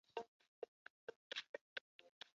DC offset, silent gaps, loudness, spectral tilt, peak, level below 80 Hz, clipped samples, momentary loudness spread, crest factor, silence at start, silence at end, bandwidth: under 0.1%; 0.28-0.40 s, 0.48-0.62 s, 0.68-1.07 s, 1.16-1.30 s, 1.49-1.54 s, 1.61-1.99 s; -54 LUFS; 2 dB/octave; -30 dBFS; under -90 dBFS; under 0.1%; 11 LU; 26 dB; 0.15 s; 0.25 s; 7.4 kHz